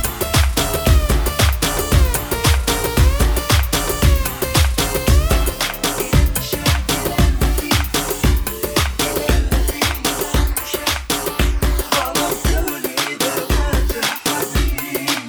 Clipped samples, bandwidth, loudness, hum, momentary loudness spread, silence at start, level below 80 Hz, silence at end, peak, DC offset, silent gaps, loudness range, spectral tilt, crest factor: under 0.1%; over 20 kHz; -18 LUFS; none; 4 LU; 0 s; -20 dBFS; 0 s; 0 dBFS; under 0.1%; none; 2 LU; -4 dB/octave; 16 dB